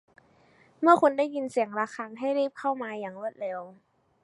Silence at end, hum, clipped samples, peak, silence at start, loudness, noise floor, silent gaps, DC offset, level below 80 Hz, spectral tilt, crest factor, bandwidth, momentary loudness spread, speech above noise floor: 0.5 s; none; under 0.1%; -4 dBFS; 0.8 s; -27 LUFS; -61 dBFS; none; under 0.1%; -80 dBFS; -5.5 dB/octave; 24 dB; 11.5 kHz; 15 LU; 34 dB